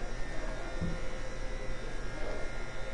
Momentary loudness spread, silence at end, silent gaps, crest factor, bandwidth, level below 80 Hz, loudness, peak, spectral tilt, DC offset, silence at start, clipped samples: 4 LU; 0 s; none; 12 dB; 10.5 kHz; -38 dBFS; -41 LUFS; -22 dBFS; -5 dB/octave; under 0.1%; 0 s; under 0.1%